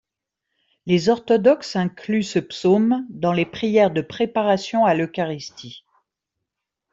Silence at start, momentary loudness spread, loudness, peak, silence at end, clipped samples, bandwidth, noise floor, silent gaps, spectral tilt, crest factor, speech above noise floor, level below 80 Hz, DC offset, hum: 0.85 s; 10 LU; -20 LUFS; -4 dBFS; 1.15 s; under 0.1%; 7.8 kHz; -82 dBFS; none; -6 dB/octave; 18 dB; 62 dB; -62 dBFS; under 0.1%; none